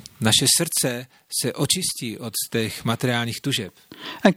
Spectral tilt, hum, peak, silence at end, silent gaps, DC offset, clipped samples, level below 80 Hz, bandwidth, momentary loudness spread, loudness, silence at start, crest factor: -3 dB/octave; none; -2 dBFS; 0 s; none; under 0.1%; under 0.1%; -58 dBFS; 17 kHz; 13 LU; -22 LUFS; 0.2 s; 22 dB